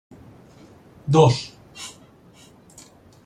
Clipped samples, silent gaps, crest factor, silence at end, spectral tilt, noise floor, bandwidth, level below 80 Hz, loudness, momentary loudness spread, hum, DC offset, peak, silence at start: under 0.1%; none; 22 dB; 1.35 s; -6.5 dB/octave; -50 dBFS; 12.5 kHz; -56 dBFS; -18 LUFS; 22 LU; none; under 0.1%; -4 dBFS; 1.05 s